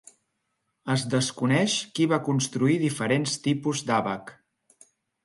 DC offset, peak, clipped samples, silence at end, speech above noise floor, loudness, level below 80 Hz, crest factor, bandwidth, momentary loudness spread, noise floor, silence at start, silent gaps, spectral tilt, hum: under 0.1%; -10 dBFS; under 0.1%; 0.9 s; 52 dB; -25 LUFS; -68 dBFS; 18 dB; 11.5 kHz; 5 LU; -77 dBFS; 0.85 s; none; -4.5 dB/octave; none